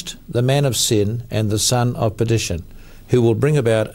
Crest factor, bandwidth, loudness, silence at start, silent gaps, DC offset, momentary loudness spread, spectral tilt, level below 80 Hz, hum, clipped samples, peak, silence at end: 14 dB; 16.5 kHz; -18 LUFS; 0 s; none; under 0.1%; 6 LU; -5 dB/octave; -40 dBFS; none; under 0.1%; -4 dBFS; 0 s